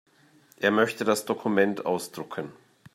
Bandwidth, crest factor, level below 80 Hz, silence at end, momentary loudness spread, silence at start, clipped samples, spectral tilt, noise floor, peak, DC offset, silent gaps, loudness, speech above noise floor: 16 kHz; 22 dB; -74 dBFS; 0.45 s; 13 LU; 0.6 s; under 0.1%; -4.5 dB/octave; -59 dBFS; -6 dBFS; under 0.1%; none; -26 LUFS; 33 dB